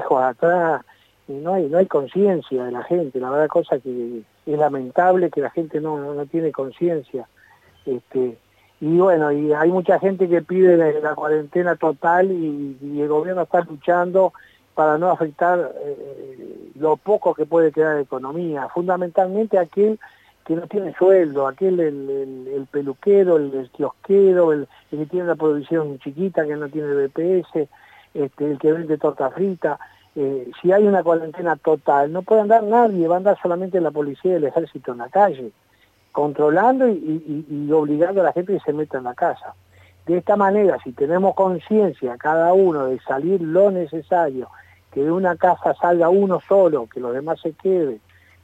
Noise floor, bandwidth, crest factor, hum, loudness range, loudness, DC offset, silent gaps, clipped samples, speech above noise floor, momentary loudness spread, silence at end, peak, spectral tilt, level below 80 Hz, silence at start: -54 dBFS; 7.8 kHz; 18 dB; none; 4 LU; -19 LUFS; under 0.1%; none; under 0.1%; 35 dB; 12 LU; 0.45 s; -2 dBFS; -9 dB/octave; -70 dBFS; 0 s